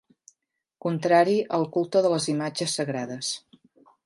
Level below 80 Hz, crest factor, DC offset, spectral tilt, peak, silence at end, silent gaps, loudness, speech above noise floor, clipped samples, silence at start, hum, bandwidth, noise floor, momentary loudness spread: -76 dBFS; 20 dB; under 0.1%; -4.5 dB/octave; -6 dBFS; 0.7 s; none; -25 LUFS; 55 dB; under 0.1%; 0.85 s; none; 11.5 kHz; -79 dBFS; 11 LU